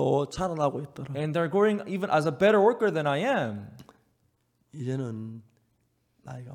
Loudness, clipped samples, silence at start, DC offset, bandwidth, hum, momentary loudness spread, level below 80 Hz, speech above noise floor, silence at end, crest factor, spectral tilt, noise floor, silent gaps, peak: -26 LUFS; under 0.1%; 0 s; under 0.1%; 13.5 kHz; none; 18 LU; -62 dBFS; 45 dB; 0 s; 18 dB; -6.5 dB/octave; -72 dBFS; none; -10 dBFS